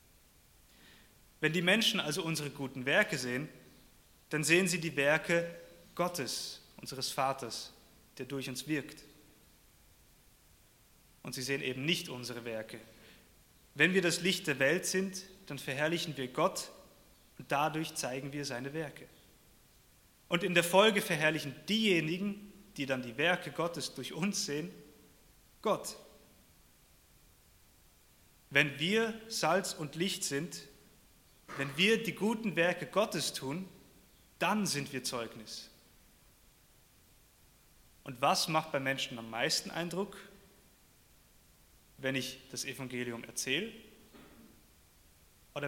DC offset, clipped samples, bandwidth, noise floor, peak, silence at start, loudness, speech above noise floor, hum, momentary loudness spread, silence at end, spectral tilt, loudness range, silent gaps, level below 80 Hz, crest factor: under 0.1%; under 0.1%; 17 kHz; -64 dBFS; -10 dBFS; 0.9 s; -33 LUFS; 31 dB; none; 17 LU; 0 s; -3.5 dB/octave; 10 LU; none; -68 dBFS; 26 dB